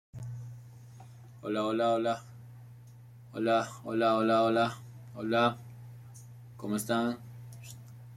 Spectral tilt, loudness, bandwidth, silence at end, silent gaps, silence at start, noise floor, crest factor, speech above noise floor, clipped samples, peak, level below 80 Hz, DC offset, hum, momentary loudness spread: -5.5 dB/octave; -30 LUFS; 15.5 kHz; 0 s; none; 0.15 s; -52 dBFS; 18 dB; 23 dB; under 0.1%; -14 dBFS; -70 dBFS; under 0.1%; none; 24 LU